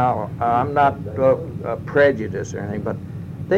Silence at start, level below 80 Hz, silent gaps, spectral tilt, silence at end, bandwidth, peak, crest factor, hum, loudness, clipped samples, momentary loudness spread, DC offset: 0 s; -48 dBFS; none; -7 dB/octave; 0 s; 8.2 kHz; -6 dBFS; 14 dB; none; -21 LUFS; under 0.1%; 11 LU; under 0.1%